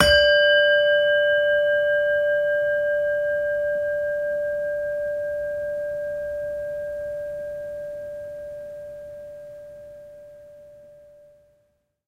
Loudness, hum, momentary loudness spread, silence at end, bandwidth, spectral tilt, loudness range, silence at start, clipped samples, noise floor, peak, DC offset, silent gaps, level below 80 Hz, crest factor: -22 LUFS; none; 22 LU; 1.15 s; 14 kHz; -3 dB/octave; 19 LU; 0 s; under 0.1%; -68 dBFS; -2 dBFS; under 0.1%; none; -48 dBFS; 22 dB